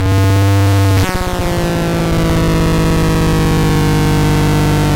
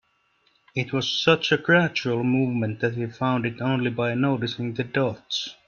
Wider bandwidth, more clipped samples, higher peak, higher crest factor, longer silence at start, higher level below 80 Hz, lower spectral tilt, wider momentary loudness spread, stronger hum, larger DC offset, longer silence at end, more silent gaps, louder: first, 17 kHz vs 7 kHz; neither; about the same, -2 dBFS vs -4 dBFS; second, 10 dB vs 20 dB; second, 0 s vs 0.75 s; first, -22 dBFS vs -62 dBFS; about the same, -6 dB/octave vs -5.5 dB/octave; second, 4 LU vs 9 LU; neither; neither; second, 0 s vs 0.15 s; neither; first, -13 LUFS vs -24 LUFS